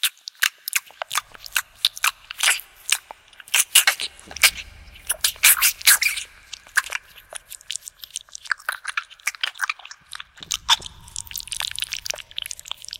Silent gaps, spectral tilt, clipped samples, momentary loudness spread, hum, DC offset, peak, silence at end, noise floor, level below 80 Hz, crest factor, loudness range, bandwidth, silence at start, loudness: none; 3 dB/octave; under 0.1%; 21 LU; none; under 0.1%; 0 dBFS; 0.05 s; -45 dBFS; -54 dBFS; 24 dB; 11 LU; 17 kHz; 0.05 s; -21 LUFS